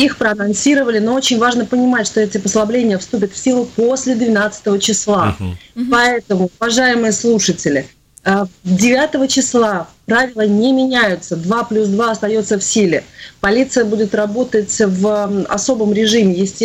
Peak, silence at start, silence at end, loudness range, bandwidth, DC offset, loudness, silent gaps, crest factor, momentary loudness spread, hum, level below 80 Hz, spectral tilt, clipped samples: -4 dBFS; 0 s; 0 s; 1 LU; 15 kHz; under 0.1%; -14 LUFS; none; 10 dB; 5 LU; none; -48 dBFS; -4 dB/octave; under 0.1%